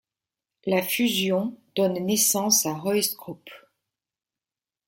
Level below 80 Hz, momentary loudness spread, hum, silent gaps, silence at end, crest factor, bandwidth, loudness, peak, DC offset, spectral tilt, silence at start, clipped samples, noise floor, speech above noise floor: -70 dBFS; 15 LU; none; none; 1.3 s; 18 dB; 17 kHz; -23 LUFS; -8 dBFS; under 0.1%; -3 dB/octave; 0.65 s; under 0.1%; under -90 dBFS; over 66 dB